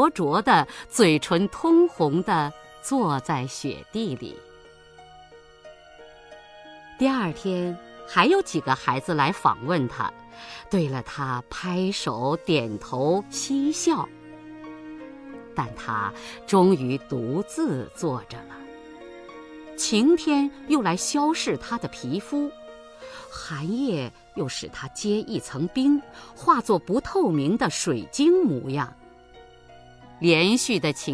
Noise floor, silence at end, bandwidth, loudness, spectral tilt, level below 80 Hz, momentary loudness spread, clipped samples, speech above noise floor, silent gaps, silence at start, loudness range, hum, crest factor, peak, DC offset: -49 dBFS; 0 s; 11 kHz; -24 LUFS; -5 dB/octave; -56 dBFS; 21 LU; under 0.1%; 26 dB; none; 0 s; 8 LU; none; 22 dB; -4 dBFS; under 0.1%